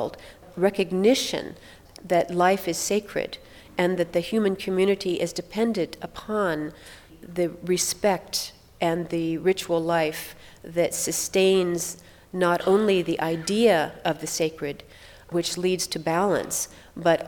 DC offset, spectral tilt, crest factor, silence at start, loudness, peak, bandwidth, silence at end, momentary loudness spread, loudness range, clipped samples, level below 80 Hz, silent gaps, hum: under 0.1%; -4 dB/octave; 18 dB; 0 s; -25 LUFS; -6 dBFS; 19.5 kHz; 0 s; 14 LU; 4 LU; under 0.1%; -56 dBFS; none; none